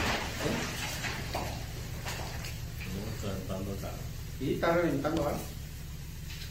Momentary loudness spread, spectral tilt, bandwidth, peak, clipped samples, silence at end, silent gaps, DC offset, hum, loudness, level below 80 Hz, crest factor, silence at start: 13 LU; -5 dB/octave; 16 kHz; -16 dBFS; under 0.1%; 0 s; none; under 0.1%; none; -35 LUFS; -44 dBFS; 18 dB; 0 s